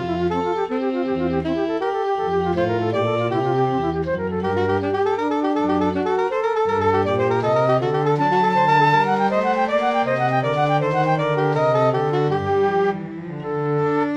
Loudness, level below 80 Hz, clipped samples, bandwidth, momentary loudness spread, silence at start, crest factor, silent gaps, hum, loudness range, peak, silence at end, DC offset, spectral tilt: -20 LUFS; -52 dBFS; under 0.1%; 9.4 kHz; 5 LU; 0 s; 14 dB; none; none; 3 LU; -6 dBFS; 0 s; under 0.1%; -7.5 dB/octave